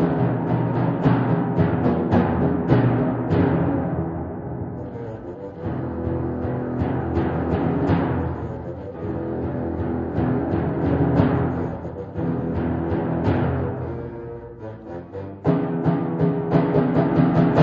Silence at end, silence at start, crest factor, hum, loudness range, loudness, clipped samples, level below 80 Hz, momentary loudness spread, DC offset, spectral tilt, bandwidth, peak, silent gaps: 0 s; 0 s; 20 dB; none; 6 LU; -23 LUFS; under 0.1%; -40 dBFS; 13 LU; under 0.1%; -10.5 dB/octave; 5.2 kHz; -2 dBFS; none